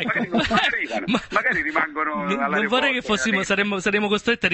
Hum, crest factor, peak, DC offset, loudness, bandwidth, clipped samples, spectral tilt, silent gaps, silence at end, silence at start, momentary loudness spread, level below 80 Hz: none; 18 dB; -4 dBFS; under 0.1%; -21 LUFS; 8.6 kHz; under 0.1%; -4 dB/octave; none; 0 s; 0 s; 4 LU; -50 dBFS